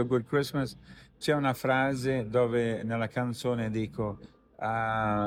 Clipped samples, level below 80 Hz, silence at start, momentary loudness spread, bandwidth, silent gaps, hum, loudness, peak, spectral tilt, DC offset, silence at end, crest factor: under 0.1%; -56 dBFS; 0 s; 9 LU; 16.5 kHz; none; none; -30 LUFS; -12 dBFS; -6.5 dB/octave; under 0.1%; 0 s; 18 dB